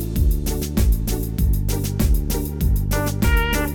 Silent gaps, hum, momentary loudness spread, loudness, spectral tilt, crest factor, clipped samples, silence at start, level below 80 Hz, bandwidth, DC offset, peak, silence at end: none; none; 4 LU; -21 LUFS; -5.5 dB/octave; 14 dB; under 0.1%; 0 s; -20 dBFS; 20 kHz; under 0.1%; -6 dBFS; 0 s